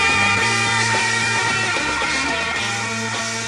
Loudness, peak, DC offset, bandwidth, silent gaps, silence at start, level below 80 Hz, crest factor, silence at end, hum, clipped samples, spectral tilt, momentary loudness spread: -18 LUFS; -6 dBFS; under 0.1%; 12.5 kHz; none; 0 s; -46 dBFS; 14 dB; 0 s; none; under 0.1%; -2 dB/octave; 7 LU